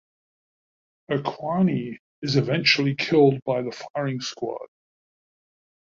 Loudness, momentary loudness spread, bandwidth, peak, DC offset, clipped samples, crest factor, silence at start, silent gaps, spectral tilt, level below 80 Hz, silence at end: -23 LUFS; 13 LU; 7.6 kHz; -4 dBFS; under 0.1%; under 0.1%; 20 dB; 1.1 s; 1.99-2.22 s, 3.42-3.46 s, 3.90-3.94 s; -5.5 dB/octave; -64 dBFS; 1.2 s